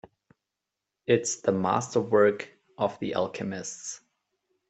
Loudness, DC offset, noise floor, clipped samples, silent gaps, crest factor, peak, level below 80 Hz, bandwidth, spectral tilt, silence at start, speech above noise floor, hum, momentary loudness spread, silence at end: -27 LUFS; under 0.1%; -86 dBFS; under 0.1%; none; 20 dB; -10 dBFS; -70 dBFS; 8.4 kHz; -4.5 dB/octave; 1.1 s; 60 dB; none; 16 LU; 0.75 s